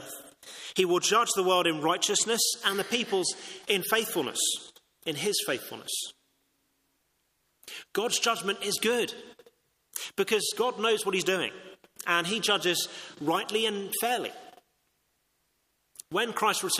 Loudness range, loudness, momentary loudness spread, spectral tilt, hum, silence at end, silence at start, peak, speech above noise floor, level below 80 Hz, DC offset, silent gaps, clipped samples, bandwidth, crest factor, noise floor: 7 LU; -28 LUFS; 13 LU; -1.5 dB/octave; none; 0 s; 0 s; -8 dBFS; 46 dB; -76 dBFS; under 0.1%; none; under 0.1%; 15.5 kHz; 22 dB; -74 dBFS